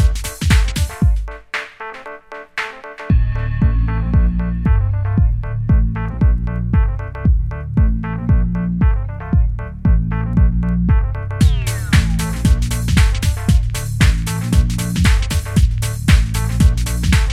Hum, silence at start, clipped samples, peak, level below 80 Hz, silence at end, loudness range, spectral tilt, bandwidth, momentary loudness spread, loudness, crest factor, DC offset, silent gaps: none; 0 s; under 0.1%; 0 dBFS; -18 dBFS; 0 s; 4 LU; -6 dB/octave; 14.5 kHz; 8 LU; -17 LUFS; 16 dB; under 0.1%; none